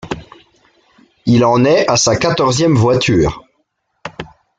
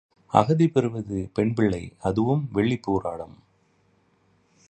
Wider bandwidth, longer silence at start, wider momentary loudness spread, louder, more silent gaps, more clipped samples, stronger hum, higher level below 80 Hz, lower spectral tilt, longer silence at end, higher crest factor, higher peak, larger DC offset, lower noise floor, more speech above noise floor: about the same, 9.2 kHz vs 9.2 kHz; second, 0.05 s vs 0.35 s; first, 20 LU vs 10 LU; first, -13 LUFS vs -24 LUFS; neither; neither; neither; first, -38 dBFS vs -50 dBFS; second, -5 dB/octave vs -8 dB/octave; second, 0.35 s vs 1.35 s; second, 14 dB vs 24 dB; about the same, -2 dBFS vs -2 dBFS; neither; about the same, -66 dBFS vs -64 dBFS; first, 54 dB vs 41 dB